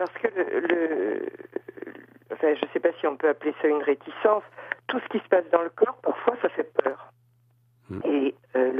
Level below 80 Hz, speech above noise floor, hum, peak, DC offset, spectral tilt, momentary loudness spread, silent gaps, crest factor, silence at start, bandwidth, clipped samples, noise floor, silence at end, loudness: -74 dBFS; 38 dB; none; -2 dBFS; under 0.1%; -7.5 dB/octave; 14 LU; none; 24 dB; 0 s; 5.2 kHz; under 0.1%; -63 dBFS; 0 s; -26 LUFS